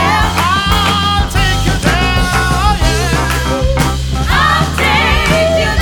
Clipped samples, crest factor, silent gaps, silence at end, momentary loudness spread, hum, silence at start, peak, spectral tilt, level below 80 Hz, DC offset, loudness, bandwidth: under 0.1%; 12 dB; none; 0 s; 4 LU; none; 0 s; 0 dBFS; -4.5 dB/octave; -18 dBFS; under 0.1%; -12 LUFS; 19.5 kHz